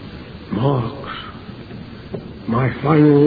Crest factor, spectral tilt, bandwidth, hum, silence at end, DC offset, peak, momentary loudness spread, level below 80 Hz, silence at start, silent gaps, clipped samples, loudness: 16 dB; -11 dB/octave; 5 kHz; none; 0 s; under 0.1%; -4 dBFS; 20 LU; -44 dBFS; 0 s; none; under 0.1%; -19 LUFS